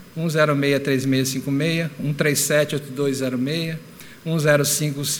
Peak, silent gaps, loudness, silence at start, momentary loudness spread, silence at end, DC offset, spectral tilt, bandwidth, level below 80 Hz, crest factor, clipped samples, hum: -4 dBFS; none; -21 LUFS; 0 s; 8 LU; 0 s; under 0.1%; -4.5 dB/octave; over 20 kHz; -64 dBFS; 18 dB; under 0.1%; none